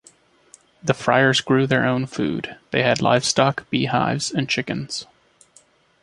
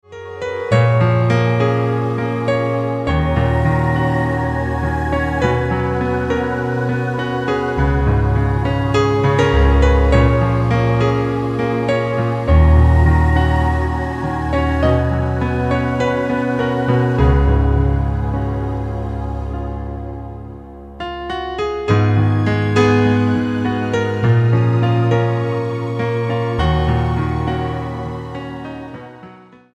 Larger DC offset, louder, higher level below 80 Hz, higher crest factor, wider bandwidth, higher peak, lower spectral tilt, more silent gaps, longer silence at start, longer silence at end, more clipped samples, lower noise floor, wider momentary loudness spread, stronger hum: second, under 0.1% vs 0.1%; second, -20 LUFS vs -17 LUFS; second, -56 dBFS vs -22 dBFS; about the same, 20 dB vs 16 dB; first, 11.5 kHz vs 8.6 kHz; about the same, -2 dBFS vs 0 dBFS; second, -4.5 dB/octave vs -8 dB/octave; neither; first, 0.85 s vs 0.1 s; first, 1 s vs 0.4 s; neither; first, -56 dBFS vs -41 dBFS; about the same, 10 LU vs 12 LU; neither